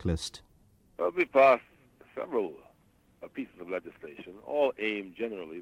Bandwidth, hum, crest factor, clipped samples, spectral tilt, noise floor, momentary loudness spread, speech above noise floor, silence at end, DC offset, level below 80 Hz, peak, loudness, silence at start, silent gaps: 13.5 kHz; none; 20 dB; under 0.1%; -5.5 dB/octave; -65 dBFS; 23 LU; 35 dB; 0 s; under 0.1%; -54 dBFS; -10 dBFS; -29 LUFS; 0 s; none